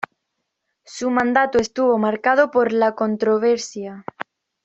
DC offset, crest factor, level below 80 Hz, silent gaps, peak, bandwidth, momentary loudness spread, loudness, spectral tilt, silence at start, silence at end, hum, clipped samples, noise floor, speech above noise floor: under 0.1%; 18 dB; -60 dBFS; none; -2 dBFS; 8.2 kHz; 16 LU; -19 LUFS; -4.5 dB/octave; 0.9 s; 0.45 s; none; under 0.1%; -77 dBFS; 58 dB